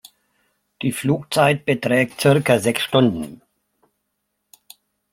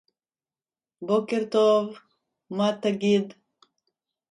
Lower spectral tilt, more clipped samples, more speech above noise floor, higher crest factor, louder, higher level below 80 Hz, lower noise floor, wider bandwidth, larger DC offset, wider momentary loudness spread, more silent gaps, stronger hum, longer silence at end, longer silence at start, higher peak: about the same, -5.5 dB/octave vs -6 dB/octave; neither; second, 57 dB vs over 67 dB; about the same, 18 dB vs 16 dB; first, -19 LUFS vs -24 LUFS; first, -58 dBFS vs -74 dBFS; second, -75 dBFS vs under -90 dBFS; first, 16.5 kHz vs 10.5 kHz; neither; second, 9 LU vs 15 LU; neither; neither; first, 1.75 s vs 1 s; second, 0.8 s vs 1 s; first, -2 dBFS vs -10 dBFS